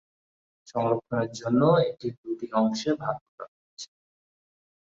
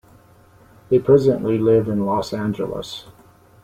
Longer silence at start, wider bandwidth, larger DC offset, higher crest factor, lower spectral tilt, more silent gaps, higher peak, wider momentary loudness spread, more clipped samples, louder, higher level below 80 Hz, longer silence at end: second, 0.7 s vs 0.9 s; second, 7.8 kHz vs 14.5 kHz; neither; about the same, 20 dB vs 18 dB; about the same, -6.5 dB/octave vs -7.5 dB/octave; first, 2.18-2.24 s, 3.21-3.38 s, 3.48-3.77 s vs none; second, -8 dBFS vs -2 dBFS; first, 22 LU vs 14 LU; neither; second, -27 LUFS vs -19 LUFS; second, -66 dBFS vs -52 dBFS; first, 1.05 s vs 0.55 s